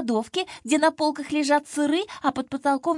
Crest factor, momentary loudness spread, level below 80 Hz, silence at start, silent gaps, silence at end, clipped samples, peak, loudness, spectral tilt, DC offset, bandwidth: 16 dB; 5 LU; -68 dBFS; 0 s; none; 0 s; under 0.1%; -8 dBFS; -24 LUFS; -3 dB/octave; under 0.1%; 11.5 kHz